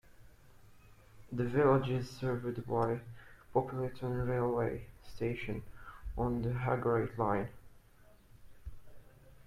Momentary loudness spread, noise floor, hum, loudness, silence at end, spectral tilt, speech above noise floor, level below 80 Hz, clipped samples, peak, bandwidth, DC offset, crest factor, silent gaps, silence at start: 22 LU; -61 dBFS; none; -35 LUFS; 0.15 s; -8.5 dB/octave; 27 dB; -54 dBFS; under 0.1%; -16 dBFS; 14.5 kHz; under 0.1%; 20 dB; none; 0.1 s